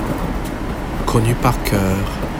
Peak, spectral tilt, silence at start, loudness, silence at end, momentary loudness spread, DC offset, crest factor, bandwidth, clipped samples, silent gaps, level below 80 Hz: 0 dBFS; -6 dB/octave; 0 s; -19 LUFS; 0 s; 8 LU; under 0.1%; 18 dB; 17 kHz; under 0.1%; none; -26 dBFS